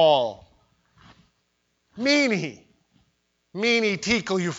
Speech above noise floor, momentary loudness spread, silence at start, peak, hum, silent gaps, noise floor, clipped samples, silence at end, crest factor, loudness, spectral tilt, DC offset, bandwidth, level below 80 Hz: 50 dB; 11 LU; 0 s; -6 dBFS; none; none; -72 dBFS; under 0.1%; 0 s; 18 dB; -23 LUFS; -4 dB/octave; under 0.1%; 8 kHz; -62 dBFS